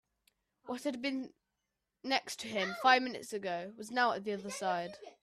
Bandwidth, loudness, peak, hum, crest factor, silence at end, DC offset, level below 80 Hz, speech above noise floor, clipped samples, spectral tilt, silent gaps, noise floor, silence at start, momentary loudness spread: 14.5 kHz; -34 LUFS; -12 dBFS; none; 24 dB; 0.1 s; under 0.1%; -80 dBFS; 52 dB; under 0.1%; -3 dB/octave; none; -87 dBFS; 0.65 s; 14 LU